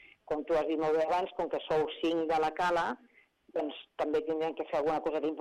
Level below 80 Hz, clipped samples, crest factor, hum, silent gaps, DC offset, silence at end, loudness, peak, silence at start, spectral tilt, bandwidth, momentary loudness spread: -64 dBFS; under 0.1%; 12 dB; none; none; under 0.1%; 0 s; -32 LUFS; -20 dBFS; 0.3 s; -5.5 dB/octave; 11 kHz; 8 LU